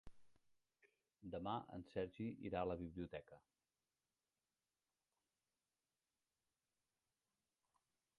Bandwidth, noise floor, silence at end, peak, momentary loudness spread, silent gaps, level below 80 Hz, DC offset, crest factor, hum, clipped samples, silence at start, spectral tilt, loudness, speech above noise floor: 9.6 kHz; under -90 dBFS; 4.8 s; -30 dBFS; 11 LU; none; -72 dBFS; under 0.1%; 24 dB; none; under 0.1%; 0.05 s; -8 dB/octave; -49 LUFS; over 42 dB